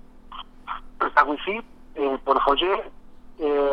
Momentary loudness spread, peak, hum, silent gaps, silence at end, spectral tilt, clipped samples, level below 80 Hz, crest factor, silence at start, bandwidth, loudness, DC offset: 21 LU; -2 dBFS; none; none; 0 s; -5 dB/octave; under 0.1%; -46 dBFS; 22 dB; 0.05 s; 6.2 kHz; -23 LUFS; under 0.1%